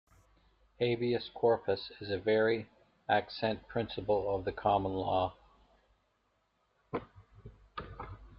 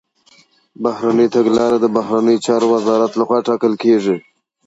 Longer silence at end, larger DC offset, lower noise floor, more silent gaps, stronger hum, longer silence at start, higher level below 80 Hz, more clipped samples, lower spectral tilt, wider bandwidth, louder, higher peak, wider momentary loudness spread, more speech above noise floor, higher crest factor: second, 0 s vs 0.45 s; neither; first, -76 dBFS vs -52 dBFS; neither; neither; about the same, 0.8 s vs 0.8 s; about the same, -60 dBFS vs -60 dBFS; neither; second, -4 dB/octave vs -6 dB/octave; second, 5.6 kHz vs 8 kHz; second, -33 LUFS vs -15 LUFS; second, -14 dBFS vs -2 dBFS; first, 17 LU vs 6 LU; first, 44 dB vs 38 dB; first, 22 dB vs 14 dB